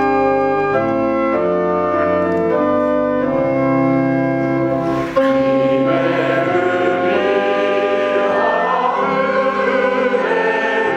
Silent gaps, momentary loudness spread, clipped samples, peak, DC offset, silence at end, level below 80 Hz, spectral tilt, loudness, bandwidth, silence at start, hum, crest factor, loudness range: none; 2 LU; under 0.1%; -2 dBFS; under 0.1%; 0 s; -48 dBFS; -7 dB/octave; -16 LUFS; 8.4 kHz; 0 s; none; 12 dB; 1 LU